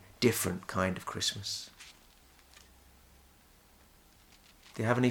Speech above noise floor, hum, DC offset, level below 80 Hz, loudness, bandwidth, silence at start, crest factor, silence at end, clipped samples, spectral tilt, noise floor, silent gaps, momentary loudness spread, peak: 30 dB; none; under 0.1%; -64 dBFS; -33 LUFS; 19.5 kHz; 0.2 s; 24 dB; 0 s; under 0.1%; -4 dB/octave; -61 dBFS; none; 19 LU; -12 dBFS